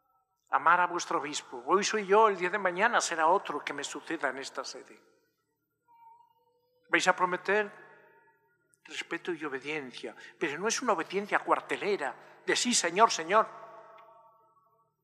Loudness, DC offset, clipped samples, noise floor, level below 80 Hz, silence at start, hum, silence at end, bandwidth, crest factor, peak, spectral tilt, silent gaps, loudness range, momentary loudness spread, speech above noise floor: -29 LUFS; under 0.1%; under 0.1%; -80 dBFS; under -90 dBFS; 0.5 s; none; 1.2 s; 14 kHz; 24 dB; -8 dBFS; -2 dB/octave; none; 8 LU; 14 LU; 50 dB